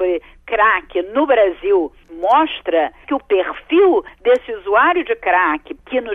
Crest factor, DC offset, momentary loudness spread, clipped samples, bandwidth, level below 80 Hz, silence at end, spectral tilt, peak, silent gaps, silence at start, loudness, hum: 14 dB; under 0.1%; 9 LU; under 0.1%; 4.5 kHz; -48 dBFS; 0 s; -5.5 dB/octave; -2 dBFS; none; 0 s; -16 LUFS; 60 Hz at -60 dBFS